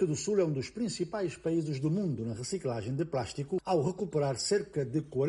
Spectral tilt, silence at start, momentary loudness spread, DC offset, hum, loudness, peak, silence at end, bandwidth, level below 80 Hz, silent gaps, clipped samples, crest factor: -6 dB/octave; 0 s; 6 LU; under 0.1%; none; -32 LUFS; -16 dBFS; 0 s; 11.5 kHz; -62 dBFS; none; under 0.1%; 16 dB